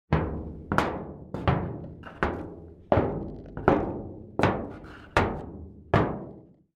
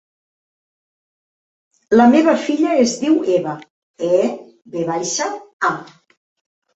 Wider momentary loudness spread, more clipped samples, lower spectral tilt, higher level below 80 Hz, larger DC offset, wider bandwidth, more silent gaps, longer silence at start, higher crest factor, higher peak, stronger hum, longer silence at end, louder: about the same, 16 LU vs 16 LU; neither; first, -7.5 dB/octave vs -4.5 dB/octave; first, -42 dBFS vs -62 dBFS; neither; first, 14 kHz vs 8.2 kHz; second, none vs 3.70-3.94 s, 5.53-5.59 s; second, 0.1 s vs 1.9 s; first, 26 dB vs 18 dB; about the same, -4 dBFS vs -2 dBFS; neither; second, 0.35 s vs 0.9 s; second, -29 LUFS vs -17 LUFS